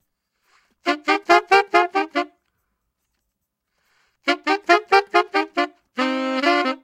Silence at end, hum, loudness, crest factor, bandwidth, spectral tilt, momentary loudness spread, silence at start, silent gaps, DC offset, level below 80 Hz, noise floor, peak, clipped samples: 0.05 s; none; -19 LUFS; 20 dB; 15.5 kHz; -2 dB/octave; 10 LU; 0.85 s; none; under 0.1%; -68 dBFS; -78 dBFS; 0 dBFS; under 0.1%